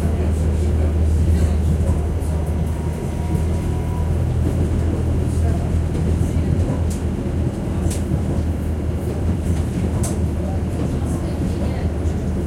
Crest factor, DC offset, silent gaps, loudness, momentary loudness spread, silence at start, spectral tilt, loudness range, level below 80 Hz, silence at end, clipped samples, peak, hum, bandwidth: 14 dB; under 0.1%; none; -21 LUFS; 4 LU; 0 s; -7.5 dB/octave; 2 LU; -26 dBFS; 0 s; under 0.1%; -4 dBFS; none; 13 kHz